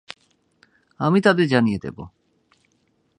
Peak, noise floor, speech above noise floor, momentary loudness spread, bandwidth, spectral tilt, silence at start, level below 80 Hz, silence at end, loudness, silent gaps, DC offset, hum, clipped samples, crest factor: -2 dBFS; -66 dBFS; 47 dB; 25 LU; 10.5 kHz; -7 dB/octave; 1 s; -56 dBFS; 1.1 s; -19 LUFS; none; under 0.1%; none; under 0.1%; 20 dB